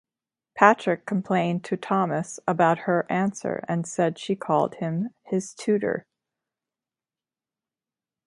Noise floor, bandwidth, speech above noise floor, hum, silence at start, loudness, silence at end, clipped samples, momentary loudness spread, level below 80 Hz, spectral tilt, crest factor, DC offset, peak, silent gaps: under -90 dBFS; 11.5 kHz; over 66 dB; none; 0.55 s; -25 LUFS; 2.25 s; under 0.1%; 10 LU; -72 dBFS; -6 dB/octave; 26 dB; under 0.1%; 0 dBFS; none